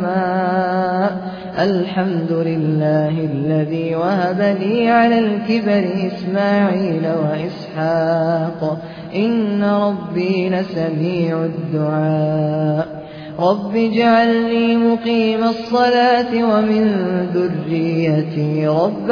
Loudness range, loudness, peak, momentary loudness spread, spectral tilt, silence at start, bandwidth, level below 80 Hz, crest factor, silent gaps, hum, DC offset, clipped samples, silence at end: 4 LU; -17 LUFS; -2 dBFS; 7 LU; -8.5 dB/octave; 0 s; 5.4 kHz; -56 dBFS; 14 dB; none; none; under 0.1%; under 0.1%; 0 s